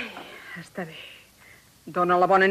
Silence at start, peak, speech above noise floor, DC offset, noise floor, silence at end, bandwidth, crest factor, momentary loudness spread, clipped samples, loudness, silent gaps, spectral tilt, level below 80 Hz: 0 s; -8 dBFS; 30 dB; under 0.1%; -53 dBFS; 0 s; 15 kHz; 18 dB; 23 LU; under 0.1%; -24 LUFS; none; -6 dB/octave; -66 dBFS